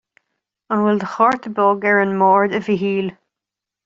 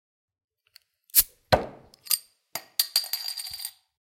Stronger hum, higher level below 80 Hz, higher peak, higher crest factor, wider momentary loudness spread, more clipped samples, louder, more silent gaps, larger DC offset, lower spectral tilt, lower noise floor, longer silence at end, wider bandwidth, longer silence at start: neither; second, -64 dBFS vs -54 dBFS; about the same, -2 dBFS vs -2 dBFS; second, 16 dB vs 28 dB; second, 8 LU vs 17 LU; neither; first, -17 LUFS vs -25 LUFS; neither; neither; first, -7.5 dB/octave vs -1.5 dB/octave; first, -85 dBFS vs -61 dBFS; first, 0.75 s vs 0.5 s; second, 7.4 kHz vs 16.5 kHz; second, 0.7 s vs 1.15 s